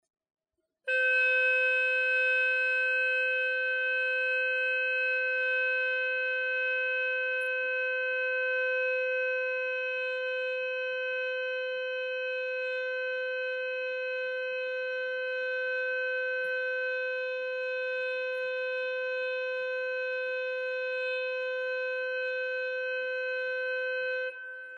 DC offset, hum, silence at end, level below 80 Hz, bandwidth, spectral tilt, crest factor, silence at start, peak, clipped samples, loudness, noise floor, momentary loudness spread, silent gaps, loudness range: under 0.1%; none; 0 s; under -90 dBFS; 8.2 kHz; 0.5 dB/octave; 12 dB; 0.85 s; -20 dBFS; under 0.1%; -29 LUFS; -79 dBFS; 7 LU; none; 6 LU